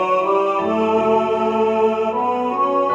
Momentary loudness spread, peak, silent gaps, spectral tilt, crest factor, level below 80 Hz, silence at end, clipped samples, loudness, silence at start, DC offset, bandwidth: 3 LU; -6 dBFS; none; -6.5 dB/octave; 12 dB; -64 dBFS; 0 s; under 0.1%; -18 LUFS; 0 s; under 0.1%; 7.8 kHz